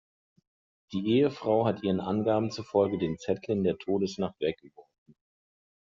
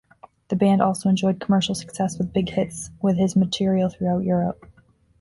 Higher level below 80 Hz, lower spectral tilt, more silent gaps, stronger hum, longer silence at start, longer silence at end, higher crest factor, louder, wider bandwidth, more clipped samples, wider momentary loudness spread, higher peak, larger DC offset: second, -66 dBFS vs -52 dBFS; about the same, -6.5 dB/octave vs -6.5 dB/octave; neither; neither; first, 0.9 s vs 0.5 s; first, 1.05 s vs 0.65 s; about the same, 18 dB vs 18 dB; second, -29 LUFS vs -22 LUFS; second, 7.6 kHz vs 11.5 kHz; neither; about the same, 8 LU vs 7 LU; second, -12 dBFS vs -6 dBFS; neither